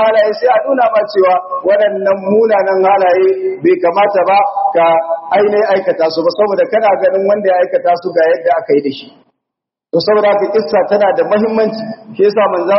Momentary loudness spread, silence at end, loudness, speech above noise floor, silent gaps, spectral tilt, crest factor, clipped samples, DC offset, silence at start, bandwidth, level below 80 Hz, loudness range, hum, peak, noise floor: 4 LU; 0 s; -12 LUFS; 70 dB; none; -3.5 dB/octave; 12 dB; under 0.1%; under 0.1%; 0 s; 6 kHz; -62 dBFS; 3 LU; none; 0 dBFS; -81 dBFS